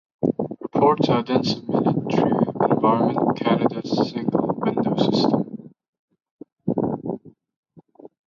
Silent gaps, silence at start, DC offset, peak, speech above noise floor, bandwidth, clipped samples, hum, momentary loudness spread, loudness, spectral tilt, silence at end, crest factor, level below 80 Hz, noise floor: 5.88-5.93 s, 5.99-6.08 s, 6.31-6.39 s, 6.52-6.56 s, 7.56-7.63 s; 0.2 s; under 0.1%; -6 dBFS; 27 dB; 7.4 kHz; under 0.1%; none; 10 LU; -22 LUFS; -7.5 dB/octave; 0.2 s; 16 dB; -60 dBFS; -47 dBFS